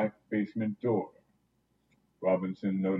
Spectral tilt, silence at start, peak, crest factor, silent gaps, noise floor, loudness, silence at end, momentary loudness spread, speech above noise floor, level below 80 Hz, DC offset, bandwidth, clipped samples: -10.5 dB/octave; 0 s; -16 dBFS; 18 dB; none; -74 dBFS; -32 LUFS; 0 s; 4 LU; 43 dB; -78 dBFS; under 0.1%; 5.6 kHz; under 0.1%